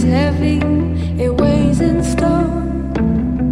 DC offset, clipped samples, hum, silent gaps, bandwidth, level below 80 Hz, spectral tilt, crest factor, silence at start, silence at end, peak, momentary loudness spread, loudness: under 0.1%; under 0.1%; none; none; 12 kHz; -24 dBFS; -7.5 dB/octave; 12 dB; 0 s; 0 s; -2 dBFS; 5 LU; -16 LUFS